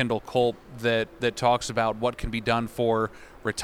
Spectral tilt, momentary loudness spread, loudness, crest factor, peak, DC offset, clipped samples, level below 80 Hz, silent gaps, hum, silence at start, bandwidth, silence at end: -5 dB/octave; 6 LU; -26 LUFS; 18 dB; -8 dBFS; under 0.1%; under 0.1%; -46 dBFS; none; none; 0 s; 16 kHz; 0 s